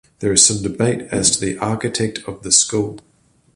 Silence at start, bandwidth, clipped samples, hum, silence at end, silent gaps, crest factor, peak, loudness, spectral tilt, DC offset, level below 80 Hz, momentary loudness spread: 0.2 s; 12 kHz; under 0.1%; none; 0.55 s; none; 20 dB; 0 dBFS; -16 LUFS; -3 dB/octave; under 0.1%; -46 dBFS; 11 LU